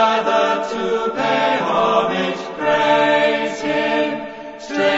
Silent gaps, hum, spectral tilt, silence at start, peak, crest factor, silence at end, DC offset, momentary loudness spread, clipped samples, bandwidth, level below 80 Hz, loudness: none; none; -4.5 dB/octave; 0 s; -2 dBFS; 16 dB; 0 s; under 0.1%; 8 LU; under 0.1%; 8 kHz; -58 dBFS; -18 LUFS